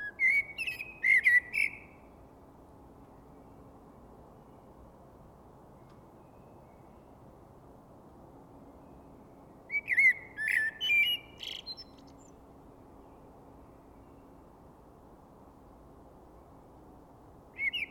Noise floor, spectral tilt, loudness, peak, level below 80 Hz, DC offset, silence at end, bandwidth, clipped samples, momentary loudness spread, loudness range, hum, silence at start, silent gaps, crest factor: -55 dBFS; -2 dB/octave; -27 LUFS; -16 dBFS; -64 dBFS; under 0.1%; 0.05 s; 18.5 kHz; under 0.1%; 19 LU; 18 LU; none; 0 s; none; 20 dB